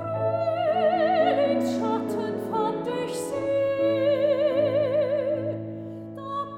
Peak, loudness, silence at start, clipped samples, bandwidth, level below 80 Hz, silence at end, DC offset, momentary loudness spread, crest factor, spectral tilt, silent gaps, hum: -10 dBFS; -25 LUFS; 0 s; under 0.1%; 15.5 kHz; -66 dBFS; 0 s; under 0.1%; 10 LU; 14 dB; -6 dB/octave; none; none